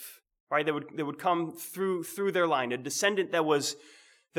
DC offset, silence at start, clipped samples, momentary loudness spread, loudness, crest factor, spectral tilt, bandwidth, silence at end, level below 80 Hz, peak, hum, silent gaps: under 0.1%; 0 s; under 0.1%; 8 LU; -30 LUFS; 18 dB; -3.5 dB/octave; over 20 kHz; 0 s; -88 dBFS; -12 dBFS; none; 0.40-0.47 s